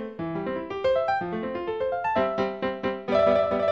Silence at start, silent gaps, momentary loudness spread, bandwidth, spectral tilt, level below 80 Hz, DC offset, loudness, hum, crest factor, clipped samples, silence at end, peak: 0 s; none; 9 LU; 7.2 kHz; -7 dB/octave; -54 dBFS; under 0.1%; -26 LUFS; none; 16 dB; under 0.1%; 0 s; -10 dBFS